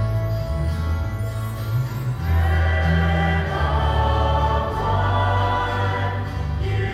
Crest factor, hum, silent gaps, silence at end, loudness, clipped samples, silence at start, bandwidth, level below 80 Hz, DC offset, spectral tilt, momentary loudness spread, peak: 14 dB; none; none; 0 s; -22 LUFS; under 0.1%; 0 s; 14.5 kHz; -26 dBFS; under 0.1%; -7 dB/octave; 6 LU; -8 dBFS